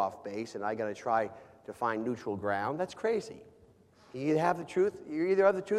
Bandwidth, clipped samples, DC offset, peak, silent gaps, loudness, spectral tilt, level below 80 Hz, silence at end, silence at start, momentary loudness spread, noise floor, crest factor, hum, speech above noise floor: 12 kHz; under 0.1%; under 0.1%; -12 dBFS; none; -32 LUFS; -6.5 dB/octave; -72 dBFS; 0 s; 0 s; 13 LU; -61 dBFS; 20 dB; none; 29 dB